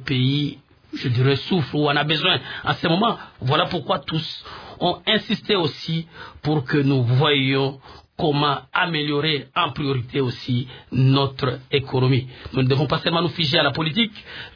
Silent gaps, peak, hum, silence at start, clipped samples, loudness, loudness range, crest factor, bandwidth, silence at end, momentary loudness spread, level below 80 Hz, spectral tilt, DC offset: none; -4 dBFS; none; 0 s; under 0.1%; -21 LUFS; 2 LU; 18 dB; 5.4 kHz; 0.05 s; 9 LU; -52 dBFS; -7.5 dB/octave; under 0.1%